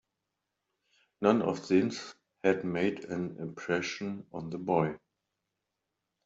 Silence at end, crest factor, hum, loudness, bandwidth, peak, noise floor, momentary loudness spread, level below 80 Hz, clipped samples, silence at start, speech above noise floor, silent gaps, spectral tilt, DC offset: 1.3 s; 22 dB; none; -31 LUFS; 8 kHz; -10 dBFS; -85 dBFS; 12 LU; -72 dBFS; under 0.1%; 1.2 s; 55 dB; none; -6 dB/octave; under 0.1%